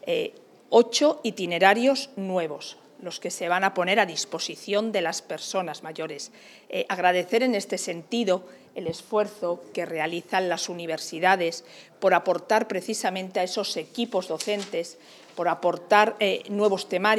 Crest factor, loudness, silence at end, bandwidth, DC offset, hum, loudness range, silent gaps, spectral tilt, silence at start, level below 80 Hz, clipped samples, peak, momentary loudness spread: 22 dB; -25 LUFS; 0 s; 15 kHz; under 0.1%; none; 4 LU; none; -3.5 dB/octave; 0.05 s; -86 dBFS; under 0.1%; -4 dBFS; 13 LU